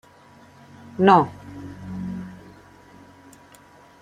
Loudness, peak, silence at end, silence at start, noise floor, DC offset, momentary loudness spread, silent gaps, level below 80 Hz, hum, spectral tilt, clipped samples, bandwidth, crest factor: -21 LUFS; -2 dBFS; 1.65 s; 1 s; -50 dBFS; under 0.1%; 24 LU; none; -60 dBFS; none; -7.5 dB/octave; under 0.1%; 11 kHz; 24 dB